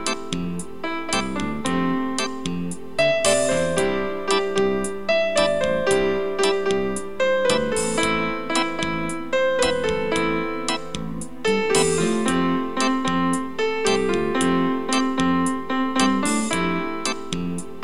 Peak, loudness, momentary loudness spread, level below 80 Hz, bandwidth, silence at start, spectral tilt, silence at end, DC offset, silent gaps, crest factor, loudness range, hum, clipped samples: -4 dBFS; -22 LUFS; 8 LU; -46 dBFS; 14.5 kHz; 0 s; -4 dB/octave; 0 s; 2%; none; 18 dB; 2 LU; none; under 0.1%